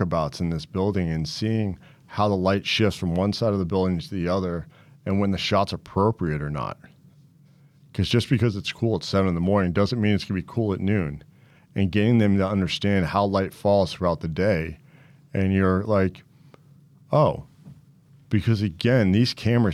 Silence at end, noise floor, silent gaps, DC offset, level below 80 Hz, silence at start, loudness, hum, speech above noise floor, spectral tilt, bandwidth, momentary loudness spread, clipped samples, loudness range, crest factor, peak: 0 s; -55 dBFS; none; under 0.1%; -50 dBFS; 0 s; -24 LUFS; none; 32 dB; -7 dB/octave; 13 kHz; 8 LU; under 0.1%; 3 LU; 16 dB; -8 dBFS